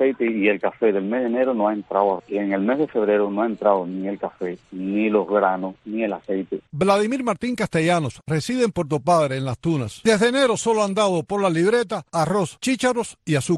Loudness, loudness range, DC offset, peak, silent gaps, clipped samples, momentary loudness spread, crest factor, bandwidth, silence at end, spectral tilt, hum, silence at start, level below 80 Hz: -22 LUFS; 3 LU; under 0.1%; -4 dBFS; none; under 0.1%; 8 LU; 18 dB; 12.5 kHz; 0 s; -5.5 dB/octave; none; 0 s; -56 dBFS